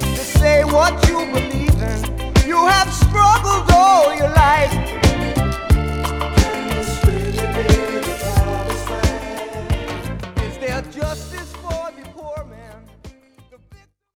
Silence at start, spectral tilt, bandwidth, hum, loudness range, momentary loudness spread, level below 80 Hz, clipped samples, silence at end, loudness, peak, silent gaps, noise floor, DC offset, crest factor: 0 s; -5 dB/octave; 20 kHz; none; 14 LU; 15 LU; -24 dBFS; under 0.1%; 0.4 s; -17 LUFS; 0 dBFS; none; -49 dBFS; under 0.1%; 16 dB